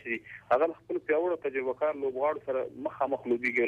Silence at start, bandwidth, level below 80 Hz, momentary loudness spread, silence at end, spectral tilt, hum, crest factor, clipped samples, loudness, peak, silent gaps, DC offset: 0.05 s; 7.2 kHz; -70 dBFS; 8 LU; 0 s; -7 dB/octave; 60 Hz at -65 dBFS; 14 dB; under 0.1%; -31 LUFS; -16 dBFS; none; under 0.1%